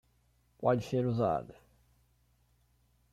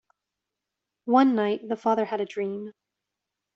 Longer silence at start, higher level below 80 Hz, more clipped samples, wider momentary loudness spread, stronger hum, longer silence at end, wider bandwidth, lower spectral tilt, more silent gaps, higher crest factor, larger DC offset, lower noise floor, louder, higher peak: second, 0.6 s vs 1.05 s; first, -64 dBFS vs -76 dBFS; neither; second, 7 LU vs 17 LU; neither; first, 1.6 s vs 0.85 s; first, 13.5 kHz vs 7.2 kHz; about the same, -8 dB/octave vs -7 dB/octave; neither; about the same, 20 dB vs 20 dB; neither; second, -71 dBFS vs -86 dBFS; second, -32 LUFS vs -25 LUFS; second, -16 dBFS vs -6 dBFS